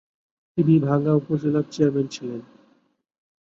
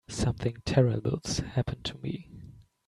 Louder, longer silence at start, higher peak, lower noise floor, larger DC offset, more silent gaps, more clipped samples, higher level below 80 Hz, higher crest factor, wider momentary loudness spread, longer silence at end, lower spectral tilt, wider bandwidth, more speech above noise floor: first, -22 LUFS vs -30 LUFS; first, 0.55 s vs 0.1 s; first, -6 dBFS vs -10 dBFS; first, -60 dBFS vs -50 dBFS; neither; neither; neither; second, -62 dBFS vs -48 dBFS; about the same, 18 dB vs 20 dB; about the same, 14 LU vs 14 LU; first, 1.1 s vs 0.25 s; first, -8.5 dB/octave vs -6 dB/octave; second, 7.6 kHz vs 12 kHz; first, 39 dB vs 21 dB